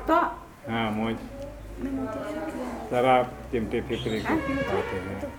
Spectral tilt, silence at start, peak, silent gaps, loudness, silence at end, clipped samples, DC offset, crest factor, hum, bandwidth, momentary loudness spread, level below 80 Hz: -6.5 dB/octave; 0 s; -8 dBFS; none; -28 LUFS; 0 s; under 0.1%; under 0.1%; 20 dB; none; 19.5 kHz; 12 LU; -46 dBFS